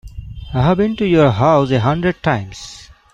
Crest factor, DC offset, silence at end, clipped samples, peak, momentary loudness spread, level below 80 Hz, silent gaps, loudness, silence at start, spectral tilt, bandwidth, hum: 14 dB; under 0.1%; 0.3 s; under 0.1%; -2 dBFS; 20 LU; -36 dBFS; none; -15 LUFS; 0.05 s; -7.5 dB/octave; 9.4 kHz; none